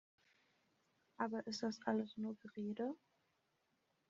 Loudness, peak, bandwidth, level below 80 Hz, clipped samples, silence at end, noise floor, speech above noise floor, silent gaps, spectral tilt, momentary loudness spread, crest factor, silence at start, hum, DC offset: -44 LUFS; -24 dBFS; 7.4 kHz; -88 dBFS; under 0.1%; 1.15 s; -83 dBFS; 40 dB; none; -4.5 dB/octave; 6 LU; 24 dB; 1.2 s; none; under 0.1%